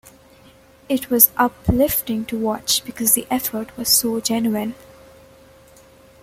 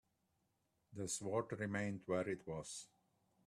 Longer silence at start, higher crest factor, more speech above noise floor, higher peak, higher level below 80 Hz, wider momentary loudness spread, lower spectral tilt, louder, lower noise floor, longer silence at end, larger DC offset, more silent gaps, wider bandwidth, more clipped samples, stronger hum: about the same, 0.9 s vs 0.9 s; about the same, 22 dB vs 20 dB; second, 29 dB vs 40 dB; first, 0 dBFS vs -24 dBFS; first, -42 dBFS vs -76 dBFS; about the same, 12 LU vs 11 LU; second, -3 dB/octave vs -4.5 dB/octave; first, -18 LUFS vs -44 LUFS; second, -49 dBFS vs -83 dBFS; first, 1.5 s vs 0.6 s; neither; neither; first, 16.5 kHz vs 14 kHz; neither; neither